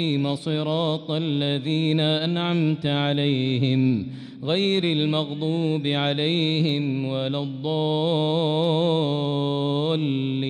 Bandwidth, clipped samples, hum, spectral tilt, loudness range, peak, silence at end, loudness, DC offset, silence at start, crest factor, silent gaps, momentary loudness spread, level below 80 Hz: 9.8 kHz; under 0.1%; none; -7.5 dB/octave; 1 LU; -10 dBFS; 0 s; -23 LUFS; under 0.1%; 0 s; 14 dB; none; 5 LU; -66 dBFS